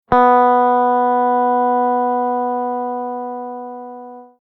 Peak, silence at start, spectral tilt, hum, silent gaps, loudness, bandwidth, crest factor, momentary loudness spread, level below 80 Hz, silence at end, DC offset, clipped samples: -2 dBFS; 0.1 s; -8.5 dB/octave; none; none; -16 LUFS; 4.2 kHz; 14 dB; 18 LU; -52 dBFS; 0.2 s; under 0.1%; under 0.1%